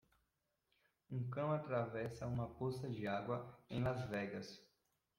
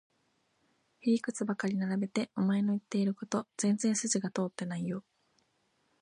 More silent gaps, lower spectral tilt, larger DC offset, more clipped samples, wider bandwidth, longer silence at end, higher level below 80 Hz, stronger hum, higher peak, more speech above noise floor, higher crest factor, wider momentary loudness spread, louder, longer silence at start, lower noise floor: neither; first, -7.5 dB/octave vs -5 dB/octave; neither; neither; first, 13 kHz vs 11 kHz; second, 0.55 s vs 1 s; first, -70 dBFS vs -78 dBFS; neither; second, -26 dBFS vs -18 dBFS; about the same, 44 dB vs 43 dB; about the same, 18 dB vs 16 dB; about the same, 8 LU vs 7 LU; second, -43 LUFS vs -33 LUFS; about the same, 1.1 s vs 1.05 s; first, -86 dBFS vs -75 dBFS